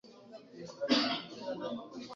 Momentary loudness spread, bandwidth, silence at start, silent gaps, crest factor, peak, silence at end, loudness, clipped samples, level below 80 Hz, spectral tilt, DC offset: 23 LU; 7.6 kHz; 0.05 s; none; 22 dB; -14 dBFS; 0 s; -35 LUFS; under 0.1%; -76 dBFS; -1.5 dB/octave; under 0.1%